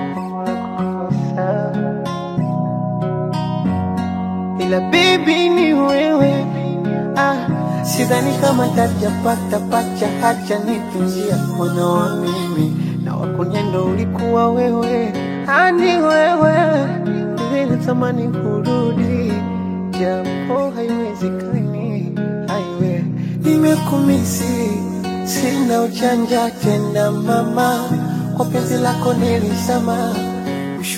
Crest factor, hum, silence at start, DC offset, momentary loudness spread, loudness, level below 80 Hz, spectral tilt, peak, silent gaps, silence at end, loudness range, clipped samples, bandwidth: 16 dB; none; 0 s; under 0.1%; 8 LU; -17 LUFS; -50 dBFS; -6 dB/octave; 0 dBFS; none; 0 s; 5 LU; under 0.1%; 16.5 kHz